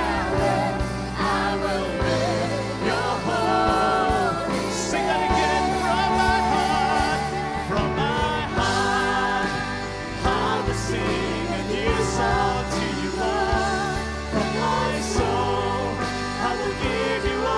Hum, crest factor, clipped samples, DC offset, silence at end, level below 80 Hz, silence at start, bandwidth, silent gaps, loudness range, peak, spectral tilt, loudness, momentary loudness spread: none; 16 dB; under 0.1%; under 0.1%; 0 s; -36 dBFS; 0 s; 11 kHz; none; 2 LU; -8 dBFS; -4.5 dB/octave; -23 LUFS; 5 LU